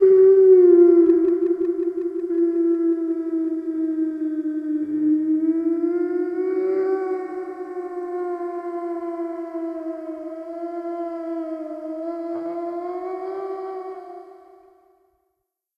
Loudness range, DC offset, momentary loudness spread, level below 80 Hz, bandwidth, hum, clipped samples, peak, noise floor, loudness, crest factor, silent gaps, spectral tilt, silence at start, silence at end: 12 LU; under 0.1%; 18 LU; -70 dBFS; 2.5 kHz; none; under 0.1%; -4 dBFS; -77 dBFS; -21 LUFS; 16 dB; none; -8.5 dB/octave; 0 s; 1.4 s